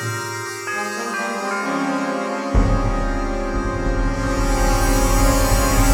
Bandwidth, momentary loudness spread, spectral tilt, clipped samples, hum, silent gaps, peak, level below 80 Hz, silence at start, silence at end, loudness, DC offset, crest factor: 19.5 kHz; 7 LU; -4.5 dB/octave; under 0.1%; none; none; -4 dBFS; -22 dBFS; 0 s; 0 s; -21 LUFS; under 0.1%; 16 dB